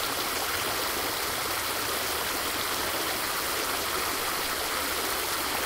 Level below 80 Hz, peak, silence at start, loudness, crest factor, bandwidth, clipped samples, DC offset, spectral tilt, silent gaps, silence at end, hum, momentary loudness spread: -52 dBFS; -14 dBFS; 0 s; -28 LUFS; 16 dB; 16 kHz; under 0.1%; under 0.1%; -1 dB/octave; none; 0 s; none; 0 LU